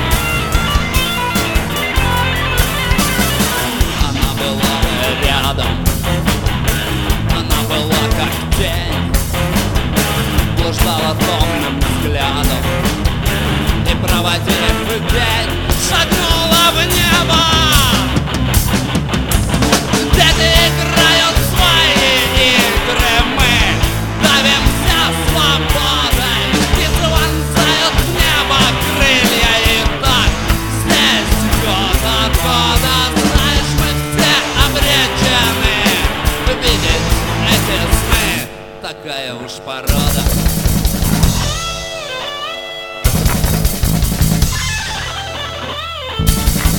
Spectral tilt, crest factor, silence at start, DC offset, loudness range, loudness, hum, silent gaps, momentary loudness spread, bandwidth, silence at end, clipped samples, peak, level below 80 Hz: -3.5 dB/octave; 14 dB; 0 s; under 0.1%; 6 LU; -13 LUFS; none; none; 7 LU; 19.5 kHz; 0 s; under 0.1%; 0 dBFS; -20 dBFS